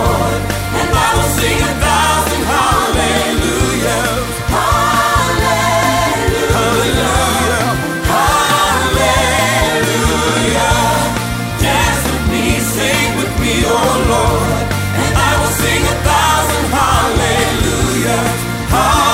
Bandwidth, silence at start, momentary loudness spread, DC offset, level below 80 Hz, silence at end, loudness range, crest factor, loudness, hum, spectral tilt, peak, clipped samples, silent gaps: 16.5 kHz; 0 s; 4 LU; under 0.1%; -24 dBFS; 0 s; 1 LU; 12 dB; -13 LUFS; none; -4 dB/octave; 0 dBFS; under 0.1%; none